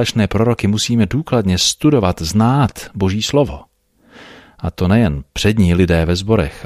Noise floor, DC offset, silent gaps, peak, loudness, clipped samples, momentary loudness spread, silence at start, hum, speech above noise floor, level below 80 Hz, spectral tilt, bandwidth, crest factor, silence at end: -48 dBFS; under 0.1%; none; -2 dBFS; -15 LUFS; under 0.1%; 7 LU; 0 s; none; 33 dB; -32 dBFS; -5.5 dB/octave; 15 kHz; 14 dB; 0 s